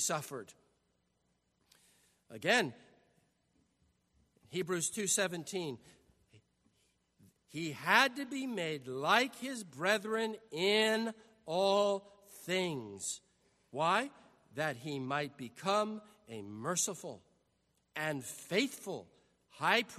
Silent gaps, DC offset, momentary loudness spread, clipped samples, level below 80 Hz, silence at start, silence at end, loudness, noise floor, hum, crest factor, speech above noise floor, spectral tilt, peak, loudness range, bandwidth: none; under 0.1%; 17 LU; under 0.1%; -82 dBFS; 0 s; 0 s; -34 LUFS; -79 dBFS; none; 26 dB; 44 dB; -2.5 dB/octave; -12 dBFS; 6 LU; 13.5 kHz